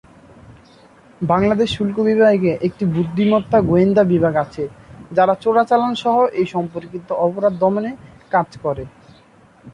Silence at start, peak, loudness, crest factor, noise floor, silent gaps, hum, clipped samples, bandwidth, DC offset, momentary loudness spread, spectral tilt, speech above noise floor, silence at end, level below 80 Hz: 0.5 s; -2 dBFS; -17 LUFS; 16 dB; -49 dBFS; none; none; under 0.1%; 10 kHz; under 0.1%; 13 LU; -8 dB/octave; 32 dB; 0.05 s; -48 dBFS